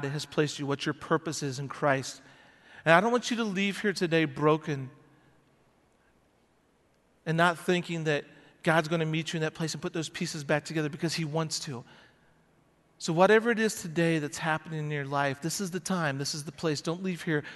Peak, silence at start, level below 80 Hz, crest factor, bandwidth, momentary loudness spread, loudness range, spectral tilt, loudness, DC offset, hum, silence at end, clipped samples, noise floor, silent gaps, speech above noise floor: -4 dBFS; 0 s; -70 dBFS; 26 dB; 12 kHz; 11 LU; 5 LU; -5 dB/octave; -29 LUFS; under 0.1%; none; 0 s; under 0.1%; -67 dBFS; none; 38 dB